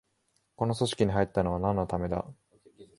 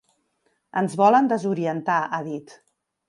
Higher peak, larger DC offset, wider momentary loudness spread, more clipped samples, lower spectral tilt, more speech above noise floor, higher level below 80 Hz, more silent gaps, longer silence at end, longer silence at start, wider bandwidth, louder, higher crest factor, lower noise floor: second, -12 dBFS vs -6 dBFS; neither; second, 7 LU vs 13 LU; neither; about the same, -6.5 dB/octave vs -6.5 dB/octave; about the same, 46 dB vs 49 dB; first, -48 dBFS vs -74 dBFS; neither; second, 0.15 s vs 0.55 s; second, 0.6 s vs 0.75 s; about the same, 11.5 kHz vs 11.5 kHz; second, -29 LUFS vs -22 LUFS; about the same, 20 dB vs 18 dB; first, -74 dBFS vs -70 dBFS